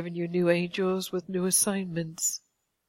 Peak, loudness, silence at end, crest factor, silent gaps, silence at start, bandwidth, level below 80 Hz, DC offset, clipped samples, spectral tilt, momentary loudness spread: -10 dBFS; -27 LUFS; 0.5 s; 18 dB; none; 0 s; 16.5 kHz; -70 dBFS; under 0.1%; under 0.1%; -4 dB/octave; 8 LU